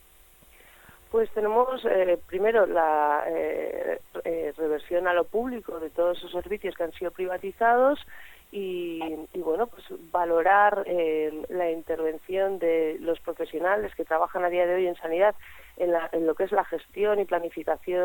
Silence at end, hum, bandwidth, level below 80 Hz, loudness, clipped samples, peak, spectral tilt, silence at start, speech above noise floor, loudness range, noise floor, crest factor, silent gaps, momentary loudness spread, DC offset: 0 s; none; 17.5 kHz; -58 dBFS; -26 LUFS; under 0.1%; -8 dBFS; -5.5 dB/octave; 1.1 s; 29 dB; 3 LU; -55 dBFS; 18 dB; none; 10 LU; under 0.1%